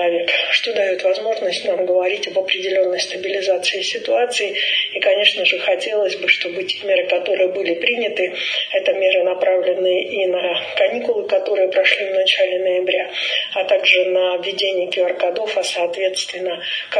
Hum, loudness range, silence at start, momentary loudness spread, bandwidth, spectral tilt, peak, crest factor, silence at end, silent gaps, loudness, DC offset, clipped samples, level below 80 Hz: none; 2 LU; 0 s; 6 LU; 10.5 kHz; -1.5 dB/octave; 0 dBFS; 18 dB; 0 s; none; -17 LUFS; under 0.1%; under 0.1%; -74 dBFS